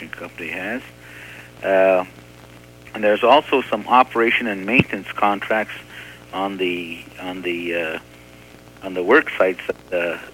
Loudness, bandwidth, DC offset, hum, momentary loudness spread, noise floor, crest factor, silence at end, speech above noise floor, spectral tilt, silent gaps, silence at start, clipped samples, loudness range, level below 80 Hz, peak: -19 LUFS; 17 kHz; under 0.1%; 60 Hz at -45 dBFS; 19 LU; -44 dBFS; 20 dB; 0.05 s; 24 dB; -5.5 dB/octave; none; 0 s; under 0.1%; 8 LU; -54 dBFS; -2 dBFS